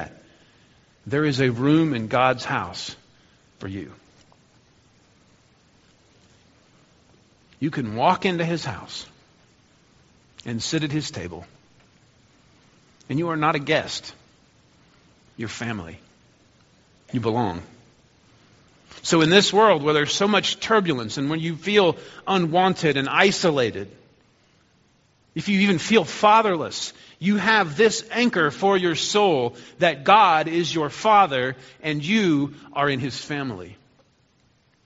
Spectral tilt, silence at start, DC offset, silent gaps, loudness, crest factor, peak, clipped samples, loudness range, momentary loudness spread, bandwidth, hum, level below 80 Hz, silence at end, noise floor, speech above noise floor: -3.5 dB/octave; 0 s; under 0.1%; none; -21 LUFS; 22 dB; 0 dBFS; under 0.1%; 12 LU; 17 LU; 8 kHz; none; -62 dBFS; 1.1 s; -62 dBFS; 41 dB